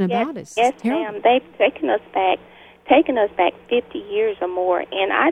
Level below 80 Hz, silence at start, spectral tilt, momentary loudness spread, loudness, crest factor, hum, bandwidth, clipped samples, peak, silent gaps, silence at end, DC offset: -60 dBFS; 0 s; -5.5 dB/octave; 6 LU; -20 LUFS; 18 dB; none; 11 kHz; under 0.1%; -2 dBFS; none; 0 s; under 0.1%